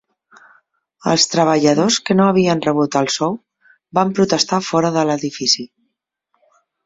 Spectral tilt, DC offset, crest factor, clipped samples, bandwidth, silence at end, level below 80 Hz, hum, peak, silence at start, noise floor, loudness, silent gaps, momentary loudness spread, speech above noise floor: -4 dB/octave; under 0.1%; 16 dB; under 0.1%; 8 kHz; 1.2 s; -58 dBFS; none; -2 dBFS; 1.05 s; -74 dBFS; -16 LUFS; none; 7 LU; 58 dB